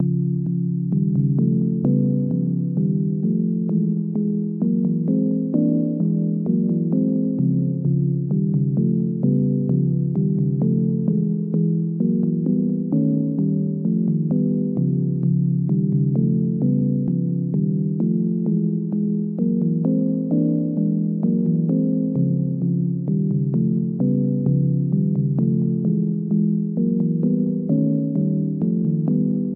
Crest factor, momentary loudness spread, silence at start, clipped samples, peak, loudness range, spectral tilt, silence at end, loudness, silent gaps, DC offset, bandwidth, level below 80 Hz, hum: 12 dB; 2 LU; 0 s; under 0.1%; -8 dBFS; 1 LU; -17 dB/octave; 0 s; -21 LUFS; none; under 0.1%; 1.3 kHz; -60 dBFS; none